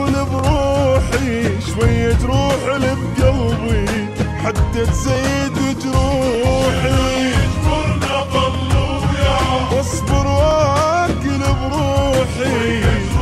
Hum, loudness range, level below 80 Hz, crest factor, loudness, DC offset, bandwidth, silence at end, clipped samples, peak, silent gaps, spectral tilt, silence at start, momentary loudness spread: none; 1 LU; -24 dBFS; 12 dB; -17 LUFS; under 0.1%; 13.5 kHz; 0 s; under 0.1%; -2 dBFS; none; -6 dB/octave; 0 s; 4 LU